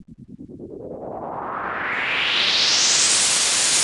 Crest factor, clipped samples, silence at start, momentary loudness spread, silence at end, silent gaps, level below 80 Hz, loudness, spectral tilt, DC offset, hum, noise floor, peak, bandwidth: 16 dB; under 0.1%; 0 s; 21 LU; 0 s; none; -56 dBFS; -17 LUFS; 1 dB/octave; under 0.1%; none; -41 dBFS; -6 dBFS; 16 kHz